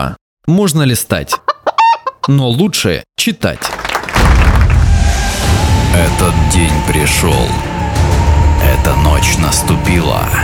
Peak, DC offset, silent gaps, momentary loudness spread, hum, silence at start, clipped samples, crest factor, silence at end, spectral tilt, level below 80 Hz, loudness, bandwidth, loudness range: 0 dBFS; under 0.1%; 0.21-0.37 s; 5 LU; none; 0 s; under 0.1%; 10 dB; 0 s; -5 dB/octave; -16 dBFS; -12 LUFS; 17.5 kHz; 2 LU